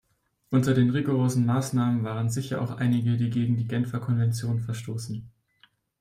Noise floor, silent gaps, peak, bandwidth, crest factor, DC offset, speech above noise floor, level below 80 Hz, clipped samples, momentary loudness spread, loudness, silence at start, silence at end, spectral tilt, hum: -63 dBFS; none; -10 dBFS; 15 kHz; 16 dB; under 0.1%; 39 dB; -60 dBFS; under 0.1%; 9 LU; -26 LUFS; 0.5 s; 0.7 s; -7 dB/octave; none